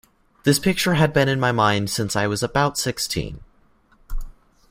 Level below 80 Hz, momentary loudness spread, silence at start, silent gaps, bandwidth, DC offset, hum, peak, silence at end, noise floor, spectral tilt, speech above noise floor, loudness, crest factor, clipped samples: -38 dBFS; 18 LU; 0.45 s; none; 16 kHz; under 0.1%; none; -2 dBFS; 0.4 s; -57 dBFS; -4.5 dB/octave; 37 dB; -20 LUFS; 20 dB; under 0.1%